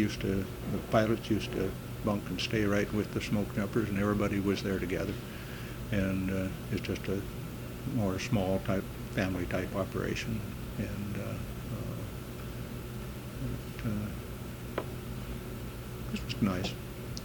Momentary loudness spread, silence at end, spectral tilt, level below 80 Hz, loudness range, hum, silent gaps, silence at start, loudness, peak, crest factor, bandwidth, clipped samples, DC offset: 11 LU; 0 s; -6 dB/octave; -46 dBFS; 7 LU; none; none; 0 s; -34 LUFS; -10 dBFS; 22 dB; 19 kHz; under 0.1%; under 0.1%